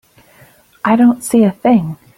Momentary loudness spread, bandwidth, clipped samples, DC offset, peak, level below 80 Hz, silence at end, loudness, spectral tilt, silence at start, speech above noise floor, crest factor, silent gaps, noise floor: 4 LU; 15 kHz; under 0.1%; under 0.1%; -2 dBFS; -54 dBFS; 0.2 s; -13 LUFS; -6.5 dB/octave; 0.85 s; 35 dB; 12 dB; none; -47 dBFS